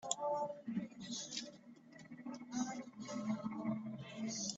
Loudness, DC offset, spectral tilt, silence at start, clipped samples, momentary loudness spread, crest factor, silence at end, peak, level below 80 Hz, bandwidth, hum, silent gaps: -44 LUFS; under 0.1%; -3.5 dB/octave; 0 s; under 0.1%; 14 LU; 26 dB; 0 s; -18 dBFS; -82 dBFS; 8.2 kHz; none; none